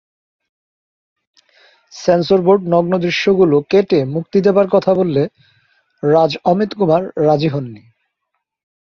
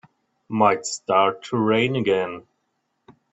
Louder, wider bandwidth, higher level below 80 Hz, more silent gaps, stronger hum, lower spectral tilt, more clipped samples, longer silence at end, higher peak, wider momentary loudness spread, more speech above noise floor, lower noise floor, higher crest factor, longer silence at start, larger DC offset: first, -15 LUFS vs -21 LUFS; second, 7 kHz vs 8.4 kHz; first, -56 dBFS vs -64 dBFS; neither; neither; first, -7 dB/octave vs -5 dB/octave; neither; first, 1.05 s vs 0.2 s; about the same, -2 dBFS vs -4 dBFS; second, 7 LU vs 10 LU; first, 60 dB vs 53 dB; about the same, -74 dBFS vs -73 dBFS; second, 14 dB vs 20 dB; first, 1.95 s vs 0.5 s; neither